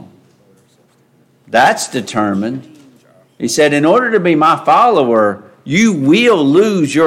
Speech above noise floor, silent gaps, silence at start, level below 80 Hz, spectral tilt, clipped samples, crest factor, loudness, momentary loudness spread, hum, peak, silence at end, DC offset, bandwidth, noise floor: 41 dB; none; 1.5 s; -60 dBFS; -5 dB/octave; under 0.1%; 12 dB; -12 LUFS; 9 LU; none; 0 dBFS; 0 s; under 0.1%; 16 kHz; -52 dBFS